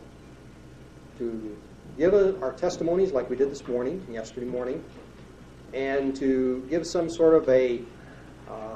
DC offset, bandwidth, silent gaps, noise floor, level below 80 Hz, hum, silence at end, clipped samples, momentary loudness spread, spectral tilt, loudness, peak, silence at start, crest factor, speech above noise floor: under 0.1%; 9.2 kHz; none; -47 dBFS; -52 dBFS; none; 0 s; under 0.1%; 23 LU; -6 dB/octave; -26 LUFS; -8 dBFS; 0 s; 20 dB; 22 dB